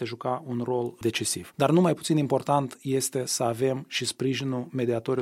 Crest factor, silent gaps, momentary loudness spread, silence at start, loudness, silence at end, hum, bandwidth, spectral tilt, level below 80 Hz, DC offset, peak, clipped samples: 18 dB; none; 7 LU; 0 s; -27 LUFS; 0 s; none; 16.5 kHz; -5 dB/octave; -66 dBFS; under 0.1%; -8 dBFS; under 0.1%